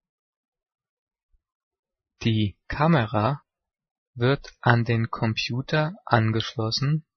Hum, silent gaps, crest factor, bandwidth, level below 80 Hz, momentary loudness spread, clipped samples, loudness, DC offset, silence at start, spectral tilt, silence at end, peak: none; 3.91-4.13 s; 24 dB; 6.6 kHz; -52 dBFS; 6 LU; under 0.1%; -24 LUFS; under 0.1%; 2.2 s; -6.5 dB/octave; 0.15 s; -2 dBFS